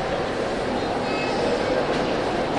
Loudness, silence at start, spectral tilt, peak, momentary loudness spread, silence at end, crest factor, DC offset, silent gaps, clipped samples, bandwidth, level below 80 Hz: -24 LUFS; 0 s; -5 dB/octave; -10 dBFS; 3 LU; 0 s; 12 dB; under 0.1%; none; under 0.1%; 11.5 kHz; -44 dBFS